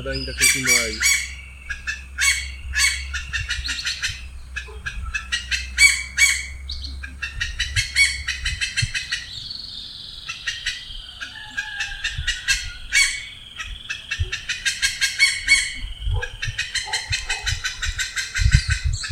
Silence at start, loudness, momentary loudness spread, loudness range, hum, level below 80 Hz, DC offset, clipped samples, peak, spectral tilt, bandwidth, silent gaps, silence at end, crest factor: 0 s; -21 LUFS; 15 LU; 7 LU; none; -32 dBFS; under 0.1%; under 0.1%; 0 dBFS; -1 dB/octave; 17 kHz; none; 0 s; 24 dB